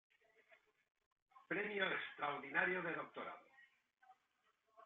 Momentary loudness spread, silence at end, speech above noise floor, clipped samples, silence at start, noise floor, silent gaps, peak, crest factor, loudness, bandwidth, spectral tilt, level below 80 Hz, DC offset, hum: 13 LU; 0 s; 40 dB; under 0.1%; 1.35 s; -83 dBFS; none; -22 dBFS; 24 dB; -42 LUFS; 7.2 kHz; -1.5 dB/octave; -88 dBFS; under 0.1%; none